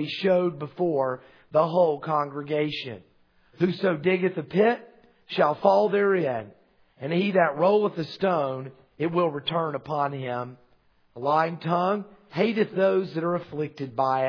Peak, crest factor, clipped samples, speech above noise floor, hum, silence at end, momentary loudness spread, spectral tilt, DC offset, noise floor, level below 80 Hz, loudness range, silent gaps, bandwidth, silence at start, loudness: -6 dBFS; 20 dB; under 0.1%; 38 dB; none; 0 s; 12 LU; -8 dB/octave; under 0.1%; -62 dBFS; -72 dBFS; 4 LU; none; 5.4 kHz; 0 s; -25 LUFS